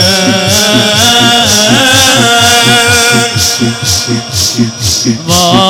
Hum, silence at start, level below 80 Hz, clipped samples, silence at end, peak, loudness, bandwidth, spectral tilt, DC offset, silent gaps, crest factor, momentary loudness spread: none; 0 s; -38 dBFS; 0.4%; 0 s; 0 dBFS; -6 LUFS; 18 kHz; -2.5 dB/octave; under 0.1%; none; 8 dB; 6 LU